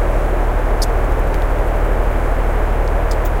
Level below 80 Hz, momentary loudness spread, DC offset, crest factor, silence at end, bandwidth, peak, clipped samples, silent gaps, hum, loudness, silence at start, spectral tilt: -16 dBFS; 1 LU; under 0.1%; 10 dB; 0 s; 16.5 kHz; -4 dBFS; under 0.1%; none; none; -19 LUFS; 0 s; -6.5 dB/octave